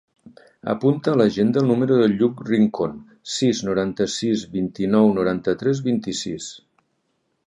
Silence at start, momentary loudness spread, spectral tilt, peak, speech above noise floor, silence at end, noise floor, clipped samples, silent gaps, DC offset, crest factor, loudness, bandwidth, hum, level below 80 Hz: 0.65 s; 10 LU; -6 dB/octave; -4 dBFS; 51 dB; 0.9 s; -71 dBFS; under 0.1%; none; under 0.1%; 18 dB; -21 LUFS; 10.5 kHz; none; -56 dBFS